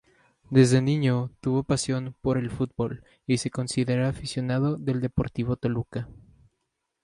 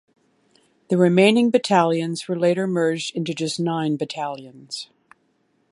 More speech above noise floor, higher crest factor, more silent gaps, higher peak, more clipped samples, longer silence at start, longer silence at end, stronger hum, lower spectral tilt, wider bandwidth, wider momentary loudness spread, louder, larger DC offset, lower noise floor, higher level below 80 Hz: first, 54 dB vs 46 dB; about the same, 20 dB vs 20 dB; neither; second, -6 dBFS vs -2 dBFS; neither; second, 0.5 s vs 0.9 s; about the same, 0.85 s vs 0.85 s; neither; about the same, -6.5 dB/octave vs -5.5 dB/octave; about the same, 11.5 kHz vs 11.5 kHz; second, 10 LU vs 17 LU; second, -26 LUFS vs -20 LUFS; neither; first, -79 dBFS vs -66 dBFS; first, -50 dBFS vs -72 dBFS